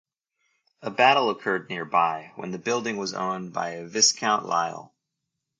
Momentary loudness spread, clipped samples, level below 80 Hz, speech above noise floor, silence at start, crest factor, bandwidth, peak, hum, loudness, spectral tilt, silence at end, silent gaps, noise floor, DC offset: 14 LU; under 0.1%; -74 dBFS; 57 dB; 0.8 s; 22 dB; 11 kHz; -4 dBFS; none; -24 LUFS; -2 dB/octave; 0.75 s; none; -82 dBFS; under 0.1%